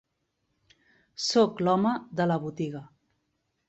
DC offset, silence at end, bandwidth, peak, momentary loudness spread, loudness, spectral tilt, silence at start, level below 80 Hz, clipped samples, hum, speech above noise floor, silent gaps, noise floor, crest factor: under 0.1%; 0.85 s; 8.2 kHz; -10 dBFS; 12 LU; -27 LUFS; -5.5 dB/octave; 1.2 s; -70 dBFS; under 0.1%; none; 51 dB; none; -78 dBFS; 18 dB